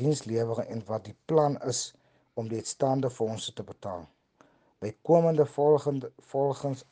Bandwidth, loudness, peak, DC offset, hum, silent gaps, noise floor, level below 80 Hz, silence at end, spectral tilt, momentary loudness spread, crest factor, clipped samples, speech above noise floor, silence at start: 10 kHz; -29 LUFS; -10 dBFS; under 0.1%; none; none; -63 dBFS; -70 dBFS; 0.1 s; -6 dB/octave; 16 LU; 20 dB; under 0.1%; 35 dB; 0 s